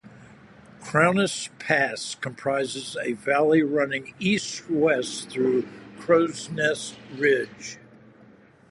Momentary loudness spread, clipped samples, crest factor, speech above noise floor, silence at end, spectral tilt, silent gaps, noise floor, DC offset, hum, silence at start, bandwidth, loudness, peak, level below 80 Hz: 13 LU; under 0.1%; 22 dB; 29 dB; 0.9 s; -4.5 dB/octave; none; -53 dBFS; under 0.1%; none; 0.05 s; 11.5 kHz; -24 LUFS; -4 dBFS; -66 dBFS